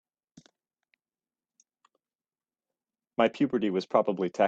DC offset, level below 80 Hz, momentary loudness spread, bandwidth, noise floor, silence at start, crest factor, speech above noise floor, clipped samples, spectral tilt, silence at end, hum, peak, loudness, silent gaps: under 0.1%; -76 dBFS; 4 LU; 8 kHz; under -90 dBFS; 3.2 s; 24 dB; over 64 dB; under 0.1%; -6.5 dB/octave; 0 s; none; -8 dBFS; -28 LUFS; none